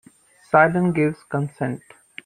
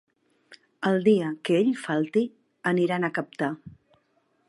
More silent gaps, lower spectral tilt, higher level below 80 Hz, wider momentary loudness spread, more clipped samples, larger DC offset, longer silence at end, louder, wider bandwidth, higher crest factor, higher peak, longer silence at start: neither; about the same, -8 dB/octave vs -7 dB/octave; first, -58 dBFS vs -72 dBFS; first, 15 LU vs 9 LU; neither; neither; second, 0.5 s vs 0.75 s; first, -21 LUFS vs -26 LUFS; second, 10 kHz vs 11.5 kHz; about the same, 20 dB vs 18 dB; first, -2 dBFS vs -8 dBFS; about the same, 0.55 s vs 0.5 s